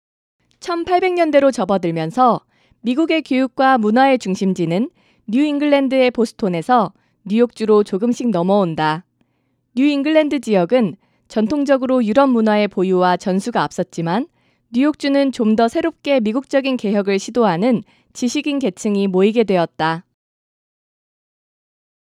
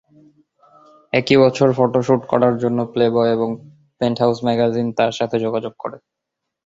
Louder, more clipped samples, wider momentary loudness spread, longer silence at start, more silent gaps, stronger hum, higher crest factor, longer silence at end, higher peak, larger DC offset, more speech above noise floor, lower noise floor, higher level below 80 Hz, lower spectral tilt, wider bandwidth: about the same, -17 LUFS vs -18 LUFS; neither; about the same, 8 LU vs 10 LU; second, 0.65 s vs 1.15 s; neither; neither; about the same, 18 dB vs 18 dB; first, 2.05 s vs 0.7 s; about the same, 0 dBFS vs -2 dBFS; neither; second, 50 dB vs 63 dB; second, -66 dBFS vs -80 dBFS; about the same, -60 dBFS vs -58 dBFS; about the same, -6 dB/octave vs -7 dB/octave; first, 11.5 kHz vs 7.8 kHz